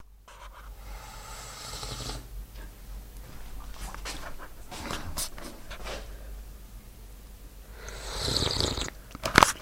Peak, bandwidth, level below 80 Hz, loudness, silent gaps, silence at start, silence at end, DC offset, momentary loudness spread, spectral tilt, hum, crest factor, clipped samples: 0 dBFS; 16.5 kHz; -42 dBFS; -31 LUFS; none; 0 s; 0 s; under 0.1%; 22 LU; -2.5 dB/octave; none; 34 dB; under 0.1%